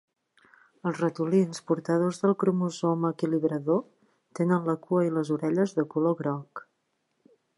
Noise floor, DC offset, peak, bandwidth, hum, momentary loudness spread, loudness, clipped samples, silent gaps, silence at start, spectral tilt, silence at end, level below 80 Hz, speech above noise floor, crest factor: -76 dBFS; under 0.1%; -12 dBFS; 11.5 kHz; none; 7 LU; -27 LUFS; under 0.1%; none; 0.85 s; -7.5 dB/octave; 1 s; -78 dBFS; 50 dB; 16 dB